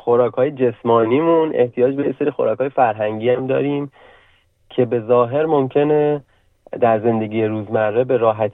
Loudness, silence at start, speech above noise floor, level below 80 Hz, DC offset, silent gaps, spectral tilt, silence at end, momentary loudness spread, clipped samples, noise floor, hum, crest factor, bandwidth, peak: -18 LUFS; 0.05 s; 39 dB; -62 dBFS; under 0.1%; none; -10.5 dB/octave; 0 s; 5 LU; under 0.1%; -56 dBFS; none; 14 dB; 3.9 kHz; -4 dBFS